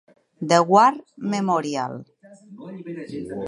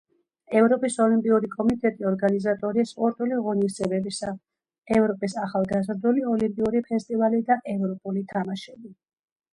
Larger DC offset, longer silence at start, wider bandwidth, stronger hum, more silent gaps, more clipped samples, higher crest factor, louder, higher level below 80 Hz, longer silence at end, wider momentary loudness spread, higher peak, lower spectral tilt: neither; about the same, 0.4 s vs 0.5 s; about the same, 11.5 kHz vs 11.5 kHz; neither; second, none vs 4.78-4.82 s; neither; about the same, 20 dB vs 18 dB; first, -20 LUFS vs -24 LUFS; second, -66 dBFS vs -60 dBFS; second, 0 s vs 0.6 s; first, 22 LU vs 8 LU; first, -2 dBFS vs -8 dBFS; about the same, -5.5 dB/octave vs -6.5 dB/octave